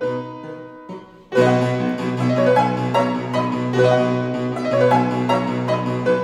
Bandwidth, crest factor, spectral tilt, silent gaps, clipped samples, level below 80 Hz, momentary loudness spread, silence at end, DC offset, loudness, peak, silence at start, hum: 11.5 kHz; 14 dB; -7 dB/octave; none; under 0.1%; -56 dBFS; 18 LU; 0 s; under 0.1%; -19 LUFS; -4 dBFS; 0 s; none